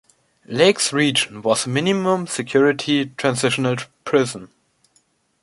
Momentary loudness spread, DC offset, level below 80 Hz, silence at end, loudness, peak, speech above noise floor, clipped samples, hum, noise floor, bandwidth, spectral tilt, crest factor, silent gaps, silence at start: 7 LU; under 0.1%; -62 dBFS; 0.95 s; -19 LUFS; -2 dBFS; 44 dB; under 0.1%; none; -63 dBFS; 11.5 kHz; -4 dB/octave; 18 dB; none; 0.5 s